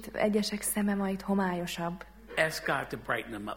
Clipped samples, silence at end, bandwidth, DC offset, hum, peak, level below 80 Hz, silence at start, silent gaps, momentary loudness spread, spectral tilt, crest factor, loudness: under 0.1%; 0 s; 17 kHz; under 0.1%; none; -10 dBFS; -56 dBFS; 0 s; none; 7 LU; -4.5 dB/octave; 20 dB; -31 LUFS